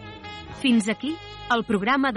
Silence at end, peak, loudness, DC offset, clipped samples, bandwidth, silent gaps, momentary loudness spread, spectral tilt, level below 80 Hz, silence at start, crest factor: 0 s; -10 dBFS; -24 LUFS; under 0.1%; under 0.1%; 11 kHz; none; 16 LU; -4.5 dB/octave; -52 dBFS; 0 s; 16 dB